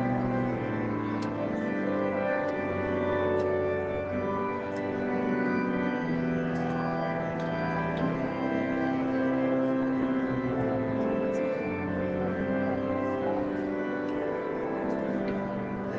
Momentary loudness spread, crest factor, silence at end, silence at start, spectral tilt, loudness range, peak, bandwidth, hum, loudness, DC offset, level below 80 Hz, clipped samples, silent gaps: 4 LU; 12 dB; 0 s; 0 s; -8.5 dB/octave; 2 LU; -16 dBFS; 7.4 kHz; none; -30 LUFS; under 0.1%; -56 dBFS; under 0.1%; none